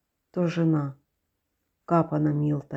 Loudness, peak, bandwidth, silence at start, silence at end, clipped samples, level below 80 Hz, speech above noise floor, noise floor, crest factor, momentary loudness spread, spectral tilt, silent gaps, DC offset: -26 LUFS; -10 dBFS; 7.4 kHz; 0.35 s; 0 s; under 0.1%; -62 dBFS; 54 dB; -78 dBFS; 18 dB; 8 LU; -9.5 dB/octave; none; under 0.1%